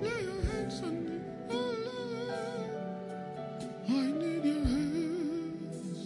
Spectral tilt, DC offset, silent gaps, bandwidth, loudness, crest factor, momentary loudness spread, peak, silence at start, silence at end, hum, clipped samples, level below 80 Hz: -6.5 dB/octave; under 0.1%; none; 11.5 kHz; -35 LUFS; 16 dB; 9 LU; -18 dBFS; 0 s; 0 s; none; under 0.1%; -48 dBFS